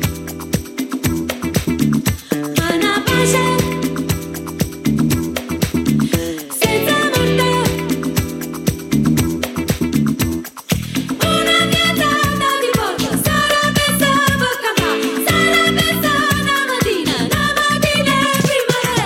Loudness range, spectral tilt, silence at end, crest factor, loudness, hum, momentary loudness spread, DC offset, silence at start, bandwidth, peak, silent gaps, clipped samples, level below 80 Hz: 4 LU; -4 dB/octave; 0 s; 16 dB; -16 LUFS; none; 8 LU; under 0.1%; 0 s; 17 kHz; 0 dBFS; none; under 0.1%; -36 dBFS